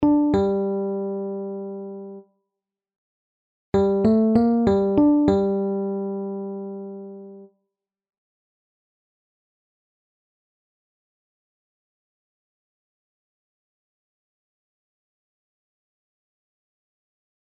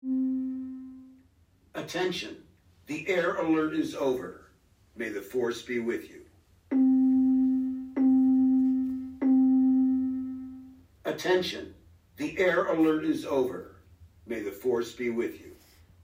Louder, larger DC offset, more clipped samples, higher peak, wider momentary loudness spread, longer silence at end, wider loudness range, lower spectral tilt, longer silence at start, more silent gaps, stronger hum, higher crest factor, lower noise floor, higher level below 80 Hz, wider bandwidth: first, -21 LUFS vs -28 LUFS; neither; neither; first, -6 dBFS vs -14 dBFS; about the same, 18 LU vs 18 LU; first, 10 s vs 0.5 s; first, 15 LU vs 7 LU; first, -9.5 dB/octave vs -5.5 dB/octave; about the same, 0 s vs 0.05 s; first, 2.96-3.72 s vs none; neither; about the same, 20 dB vs 16 dB; first, -86 dBFS vs -63 dBFS; first, -52 dBFS vs -66 dBFS; second, 7.6 kHz vs 15.5 kHz